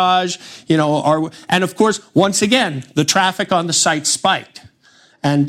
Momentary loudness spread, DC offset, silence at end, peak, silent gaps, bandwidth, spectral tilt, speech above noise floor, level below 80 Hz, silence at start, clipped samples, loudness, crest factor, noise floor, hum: 5 LU; under 0.1%; 0 s; 0 dBFS; none; 16 kHz; -3.5 dB/octave; 35 dB; -60 dBFS; 0 s; under 0.1%; -16 LUFS; 16 dB; -51 dBFS; none